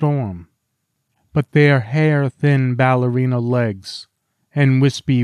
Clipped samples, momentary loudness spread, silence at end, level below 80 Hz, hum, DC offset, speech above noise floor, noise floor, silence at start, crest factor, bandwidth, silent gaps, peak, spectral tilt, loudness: under 0.1%; 14 LU; 0 s; -56 dBFS; none; under 0.1%; 56 dB; -72 dBFS; 0 s; 14 dB; 10 kHz; none; -4 dBFS; -7.5 dB/octave; -17 LUFS